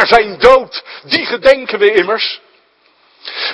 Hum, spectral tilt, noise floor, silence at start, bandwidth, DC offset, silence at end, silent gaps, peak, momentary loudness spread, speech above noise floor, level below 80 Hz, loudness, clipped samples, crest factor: none; -3.5 dB/octave; -53 dBFS; 0 s; 11 kHz; under 0.1%; 0 s; none; 0 dBFS; 17 LU; 41 dB; -42 dBFS; -11 LUFS; 1%; 12 dB